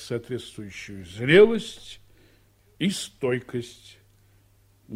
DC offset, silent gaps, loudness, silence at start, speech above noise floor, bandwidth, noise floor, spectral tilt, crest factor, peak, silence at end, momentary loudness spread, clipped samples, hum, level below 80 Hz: under 0.1%; none; -23 LUFS; 0 s; 36 dB; 15 kHz; -60 dBFS; -5 dB/octave; 22 dB; -4 dBFS; 0 s; 22 LU; under 0.1%; none; -56 dBFS